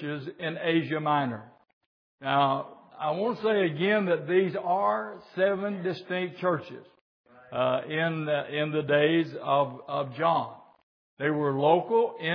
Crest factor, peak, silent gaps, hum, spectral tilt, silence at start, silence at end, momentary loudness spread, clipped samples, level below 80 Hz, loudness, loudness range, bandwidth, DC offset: 20 dB; -8 dBFS; 1.73-2.18 s, 7.01-7.24 s, 10.83-11.17 s; none; -8.5 dB/octave; 0 s; 0 s; 10 LU; under 0.1%; -80 dBFS; -27 LUFS; 3 LU; 5.4 kHz; under 0.1%